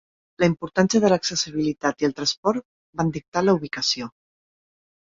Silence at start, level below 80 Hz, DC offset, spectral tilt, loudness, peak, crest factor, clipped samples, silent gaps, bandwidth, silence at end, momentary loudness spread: 0.4 s; -56 dBFS; under 0.1%; -4.5 dB/octave; -23 LUFS; -4 dBFS; 20 dB; under 0.1%; 2.37-2.43 s, 2.65-2.93 s, 3.28-3.32 s; 7.8 kHz; 0.95 s; 8 LU